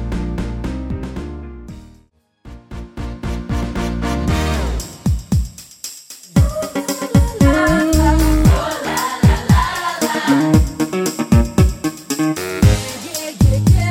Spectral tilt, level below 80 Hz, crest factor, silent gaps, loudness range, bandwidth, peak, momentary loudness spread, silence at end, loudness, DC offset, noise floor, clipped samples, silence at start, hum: -6 dB/octave; -22 dBFS; 16 dB; none; 12 LU; 17 kHz; 0 dBFS; 16 LU; 0 s; -17 LUFS; under 0.1%; -53 dBFS; under 0.1%; 0 s; none